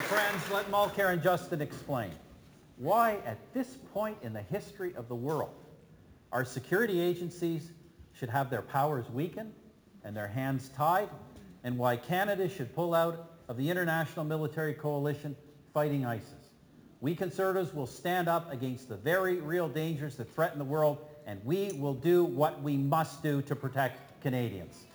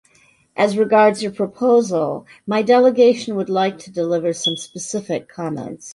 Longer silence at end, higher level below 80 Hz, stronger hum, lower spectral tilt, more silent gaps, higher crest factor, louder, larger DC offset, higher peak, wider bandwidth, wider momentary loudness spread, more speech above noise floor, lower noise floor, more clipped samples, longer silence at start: about the same, 0.1 s vs 0 s; about the same, -68 dBFS vs -64 dBFS; neither; first, -6.5 dB/octave vs -4.5 dB/octave; neither; about the same, 18 dB vs 16 dB; second, -33 LUFS vs -18 LUFS; neither; second, -14 dBFS vs -2 dBFS; first, over 20 kHz vs 11.5 kHz; about the same, 12 LU vs 13 LU; second, 26 dB vs 38 dB; about the same, -58 dBFS vs -56 dBFS; neither; second, 0 s vs 0.55 s